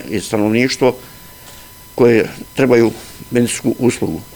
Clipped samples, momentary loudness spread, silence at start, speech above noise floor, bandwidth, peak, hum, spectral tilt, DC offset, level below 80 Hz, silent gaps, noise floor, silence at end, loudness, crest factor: under 0.1%; 23 LU; 0 s; 23 dB; over 20 kHz; 0 dBFS; none; -5.5 dB/octave; 0.2%; -46 dBFS; none; -38 dBFS; 0 s; -15 LUFS; 16 dB